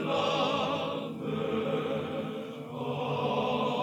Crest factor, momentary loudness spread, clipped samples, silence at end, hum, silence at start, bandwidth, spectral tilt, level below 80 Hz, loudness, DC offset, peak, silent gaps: 16 dB; 9 LU; under 0.1%; 0 s; none; 0 s; 17.5 kHz; -6 dB/octave; -72 dBFS; -31 LUFS; under 0.1%; -16 dBFS; none